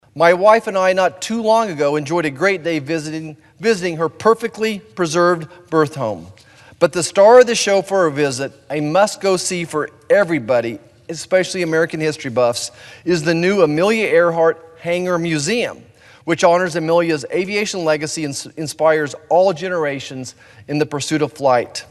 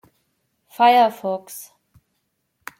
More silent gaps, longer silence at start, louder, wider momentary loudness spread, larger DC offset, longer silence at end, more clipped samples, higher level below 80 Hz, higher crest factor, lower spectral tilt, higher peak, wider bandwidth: neither; second, 0.15 s vs 0.8 s; about the same, -17 LUFS vs -18 LUFS; second, 11 LU vs 23 LU; neither; second, 0.05 s vs 1.15 s; neither; first, -60 dBFS vs -74 dBFS; about the same, 16 dB vs 20 dB; about the same, -4.5 dB/octave vs -3.5 dB/octave; first, 0 dBFS vs -4 dBFS; second, 12.5 kHz vs 16.5 kHz